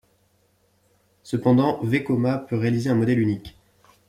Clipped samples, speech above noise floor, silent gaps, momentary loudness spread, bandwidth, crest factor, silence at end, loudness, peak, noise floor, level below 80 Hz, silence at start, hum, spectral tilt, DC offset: under 0.1%; 43 dB; none; 6 LU; 13.5 kHz; 16 dB; 0.6 s; -22 LUFS; -8 dBFS; -64 dBFS; -58 dBFS; 1.25 s; none; -8 dB/octave; under 0.1%